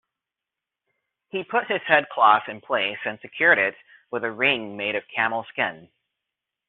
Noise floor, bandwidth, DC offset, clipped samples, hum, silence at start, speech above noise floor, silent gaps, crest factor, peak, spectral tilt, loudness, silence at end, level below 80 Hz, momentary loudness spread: -87 dBFS; 4.3 kHz; under 0.1%; under 0.1%; none; 1.35 s; 64 dB; none; 22 dB; -4 dBFS; -0.5 dB/octave; -22 LUFS; 0.85 s; -72 dBFS; 13 LU